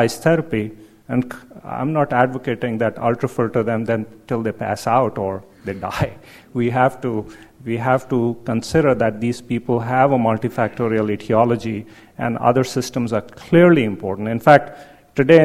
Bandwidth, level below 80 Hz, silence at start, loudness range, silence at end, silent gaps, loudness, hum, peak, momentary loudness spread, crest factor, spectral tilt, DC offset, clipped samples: 15.5 kHz; -50 dBFS; 0 s; 5 LU; 0 s; none; -19 LUFS; none; 0 dBFS; 14 LU; 18 dB; -7 dB/octave; under 0.1%; under 0.1%